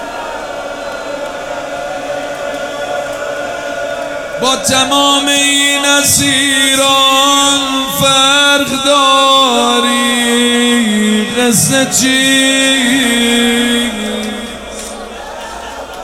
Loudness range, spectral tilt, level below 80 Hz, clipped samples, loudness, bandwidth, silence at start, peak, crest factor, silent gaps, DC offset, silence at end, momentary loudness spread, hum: 11 LU; -2 dB/octave; -44 dBFS; under 0.1%; -10 LUFS; 20 kHz; 0 s; 0 dBFS; 12 dB; none; under 0.1%; 0 s; 14 LU; none